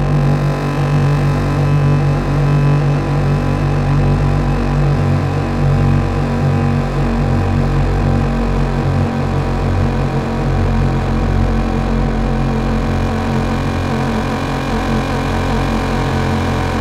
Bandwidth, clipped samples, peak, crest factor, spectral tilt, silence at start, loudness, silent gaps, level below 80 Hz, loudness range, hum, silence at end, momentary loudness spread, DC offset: 11 kHz; under 0.1%; -4 dBFS; 10 dB; -7.5 dB/octave; 0 s; -16 LUFS; none; -22 dBFS; 3 LU; none; 0 s; 4 LU; under 0.1%